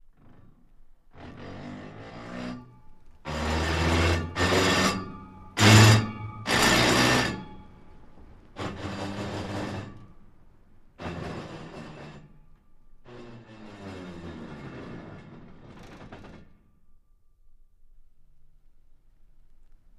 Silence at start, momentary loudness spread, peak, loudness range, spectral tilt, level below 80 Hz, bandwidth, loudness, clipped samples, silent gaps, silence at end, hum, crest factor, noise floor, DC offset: 1.15 s; 27 LU; -2 dBFS; 23 LU; -4.5 dB/octave; -44 dBFS; 15.5 kHz; -24 LUFS; under 0.1%; none; 1.95 s; none; 26 dB; -58 dBFS; under 0.1%